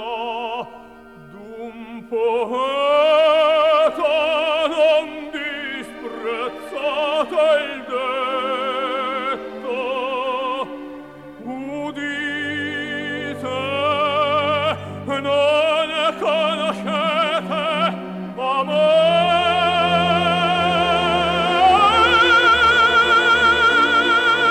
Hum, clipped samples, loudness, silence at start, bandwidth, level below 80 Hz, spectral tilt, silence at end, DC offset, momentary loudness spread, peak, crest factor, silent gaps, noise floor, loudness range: none; under 0.1%; -18 LUFS; 0 s; 13 kHz; -48 dBFS; -4.5 dB/octave; 0 s; 0.1%; 15 LU; -4 dBFS; 14 dB; none; -42 dBFS; 11 LU